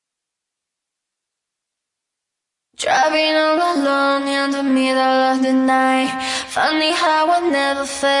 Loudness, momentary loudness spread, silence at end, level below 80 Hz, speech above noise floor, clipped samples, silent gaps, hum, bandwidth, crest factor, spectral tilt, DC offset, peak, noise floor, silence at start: -16 LUFS; 4 LU; 0 s; -62 dBFS; 66 dB; under 0.1%; none; none; 11.5 kHz; 12 dB; -2 dB/octave; under 0.1%; -6 dBFS; -82 dBFS; 2.8 s